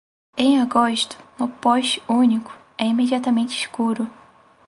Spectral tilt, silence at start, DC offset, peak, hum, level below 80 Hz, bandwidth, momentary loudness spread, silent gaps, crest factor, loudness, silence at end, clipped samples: -4 dB/octave; 0.35 s; under 0.1%; -2 dBFS; none; -64 dBFS; 11.5 kHz; 10 LU; none; 18 dB; -20 LUFS; 0.55 s; under 0.1%